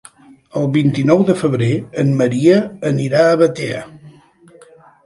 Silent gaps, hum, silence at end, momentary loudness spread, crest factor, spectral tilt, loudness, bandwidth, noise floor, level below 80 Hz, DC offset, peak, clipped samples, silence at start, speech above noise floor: none; none; 0.95 s; 10 LU; 16 dB; -7.5 dB/octave; -15 LUFS; 11.5 kHz; -46 dBFS; -56 dBFS; under 0.1%; 0 dBFS; under 0.1%; 0.55 s; 32 dB